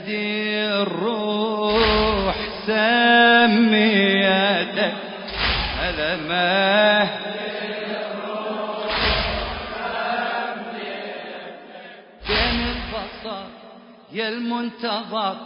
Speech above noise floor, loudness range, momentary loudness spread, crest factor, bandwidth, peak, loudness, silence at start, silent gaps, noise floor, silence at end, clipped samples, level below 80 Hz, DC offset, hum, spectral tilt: 26 dB; 10 LU; 16 LU; 18 dB; 5.4 kHz; -2 dBFS; -20 LUFS; 0 s; none; -44 dBFS; 0 s; under 0.1%; -38 dBFS; under 0.1%; none; -9 dB/octave